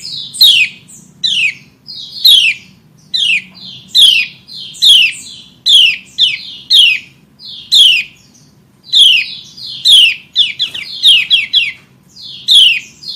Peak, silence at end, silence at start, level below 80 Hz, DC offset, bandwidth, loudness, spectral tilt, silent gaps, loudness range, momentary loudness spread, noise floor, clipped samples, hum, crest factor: 0 dBFS; 0 s; 0 s; -58 dBFS; under 0.1%; 16.5 kHz; -7 LUFS; 2.5 dB/octave; none; 2 LU; 17 LU; -45 dBFS; 0.2%; none; 12 dB